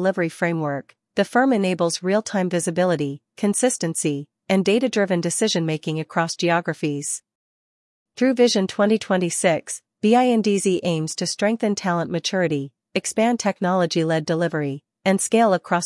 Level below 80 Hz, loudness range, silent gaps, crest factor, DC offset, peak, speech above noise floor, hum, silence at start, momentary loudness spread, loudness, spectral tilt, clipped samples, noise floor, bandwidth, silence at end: -72 dBFS; 2 LU; 7.35-8.06 s; 16 dB; under 0.1%; -4 dBFS; over 69 dB; none; 0 s; 8 LU; -21 LUFS; -4.5 dB/octave; under 0.1%; under -90 dBFS; 12 kHz; 0 s